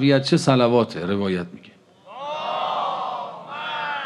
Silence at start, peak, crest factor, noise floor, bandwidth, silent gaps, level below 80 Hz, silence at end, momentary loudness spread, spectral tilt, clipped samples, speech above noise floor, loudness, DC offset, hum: 0 s; -4 dBFS; 18 dB; -49 dBFS; 12 kHz; none; -68 dBFS; 0 s; 15 LU; -6 dB/octave; under 0.1%; 30 dB; -22 LUFS; under 0.1%; none